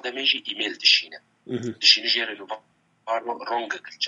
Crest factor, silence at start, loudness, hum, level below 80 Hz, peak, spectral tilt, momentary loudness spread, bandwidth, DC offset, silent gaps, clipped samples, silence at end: 24 dB; 0.05 s; -21 LUFS; none; -80 dBFS; -2 dBFS; -1.5 dB/octave; 20 LU; 11 kHz; under 0.1%; none; under 0.1%; 0 s